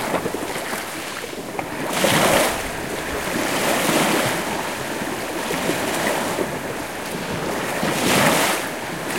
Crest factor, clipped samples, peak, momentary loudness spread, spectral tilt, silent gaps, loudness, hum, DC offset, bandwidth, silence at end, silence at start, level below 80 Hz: 20 dB; under 0.1%; -2 dBFS; 11 LU; -3 dB/octave; none; -21 LUFS; none; 0.3%; 16.5 kHz; 0 s; 0 s; -48 dBFS